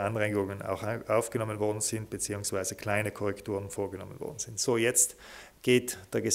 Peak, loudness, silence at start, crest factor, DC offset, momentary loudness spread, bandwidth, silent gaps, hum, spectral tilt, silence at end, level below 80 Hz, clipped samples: -12 dBFS; -30 LUFS; 0 s; 20 dB; under 0.1%; 11 LU; 16 kHz; none; none; -3.5 dB/octave; 0 s; -62 dBFS; under 0.1%